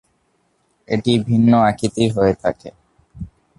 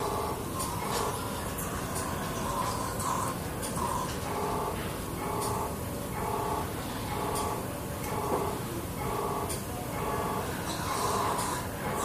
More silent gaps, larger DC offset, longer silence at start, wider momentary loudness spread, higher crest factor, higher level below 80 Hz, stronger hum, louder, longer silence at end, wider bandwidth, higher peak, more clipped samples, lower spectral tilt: neither; neither; first, 0.9 s vs 0 s; first, 22 LU vs 4 LU; about the same, 16 dB vs 18 dB; about the same, -46 dBFS vs -46 dBFS; neither; first, -17 LUFS vs -33 LUFS; first, 0.35 s vs 0 s; second, 11.5 kHz vs 15.5 kHz; first, -2 dBFS vs -16 dBFS; neither; first, -7 dB/octave vs -4.5 dB/octave